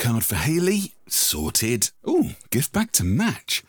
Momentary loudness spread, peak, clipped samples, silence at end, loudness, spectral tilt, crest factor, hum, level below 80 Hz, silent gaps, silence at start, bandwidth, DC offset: 4 LU; -4 dBFS; under 0.1%; 0.1 s; -22 LUFS; -3.5 dB/octave; 18 dB; none; -44 dBFS; none; 0 s; over 20 kHz; 0.2%